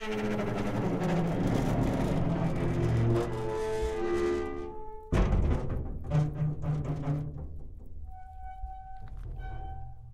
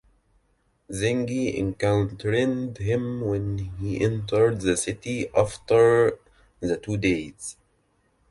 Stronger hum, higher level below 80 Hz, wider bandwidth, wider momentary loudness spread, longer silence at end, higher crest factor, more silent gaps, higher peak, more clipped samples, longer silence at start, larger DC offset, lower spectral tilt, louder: neither; first, -38 dBFS vs -48 dBFS; first, 13.5 kHz vs 11.5 kHz; first, 17 LU vs 11 LU; second, 0 s vs 0.8 s; about the same, 16 dB vs 18 dB; neither; second, -14 dBFS vs -6 dBFS; neither; second, 0 s vs 0.9 s; neither; first, -8 dB/octave vs -6 dB/octave; second, -31 LUFS vs -24 LUFS